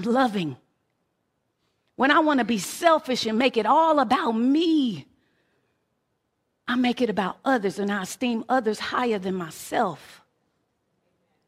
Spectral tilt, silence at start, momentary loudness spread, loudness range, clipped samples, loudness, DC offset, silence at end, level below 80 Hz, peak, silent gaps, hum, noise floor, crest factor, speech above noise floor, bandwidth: -4.5 dB/octave; 0 s; 9 LU; 6 LU; under 0.1%; -23 LUFS; under 0.1%; 1.4 s; -68 dBFS; -4 dBFS; none; none; -75 dBFS; 20 dB; 52 dB; 16 kHz